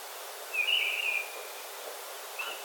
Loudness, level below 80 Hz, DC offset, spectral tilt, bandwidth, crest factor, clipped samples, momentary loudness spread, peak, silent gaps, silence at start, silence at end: -32 LUFS; under -90 dBFS; under 0.1%; 4.5 dB/octave; 18 kHz; 16 dB; under 0.1%; 14 LU; -18 dBFS; none; 0 s; 0 s